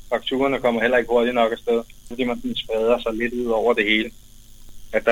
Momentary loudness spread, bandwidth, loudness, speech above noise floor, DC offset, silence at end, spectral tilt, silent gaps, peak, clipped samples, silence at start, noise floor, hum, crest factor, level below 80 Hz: 8 LU; 16.5 kHz; -21 LUFS; 20 dB; under 0.1%; 0 s; -4.5 dB/octave; none; -4 dBFS; under 0.1%; 0 s; -41 dBFS; none; 18 dB; -44 dBFS